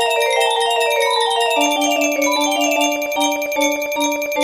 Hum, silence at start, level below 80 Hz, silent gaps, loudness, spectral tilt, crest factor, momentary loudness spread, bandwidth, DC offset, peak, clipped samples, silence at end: none; 0 s; -62 dBFS; none; -16 LUFS; 0 dB/octave; 14 dB; 3 LU; 15.5 kHz; under 0.1%; -4 dBFS; under 0.1%; 0 s